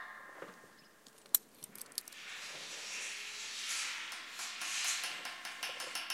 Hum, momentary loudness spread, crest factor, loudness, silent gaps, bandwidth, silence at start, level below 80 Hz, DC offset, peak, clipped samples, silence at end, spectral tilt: none; 18 LU; 34 dB; -39 LUFS; none; 16.5 kHz; 0 s; -90 dBFS; under 0.1%; -8 dBFS; under 0.1%; 0 s; 2 dB/octave